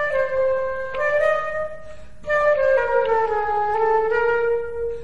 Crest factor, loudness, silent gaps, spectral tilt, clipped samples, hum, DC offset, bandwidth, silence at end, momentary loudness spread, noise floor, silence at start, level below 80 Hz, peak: 12 dB; -21 LUFS; none; -4.5 dB/octave; under 0.1%; none; 2%; 10.5 kHz; 0 s; 9 LU; -41 dBFS; 0 s; -46 dBFS; -8 dBFS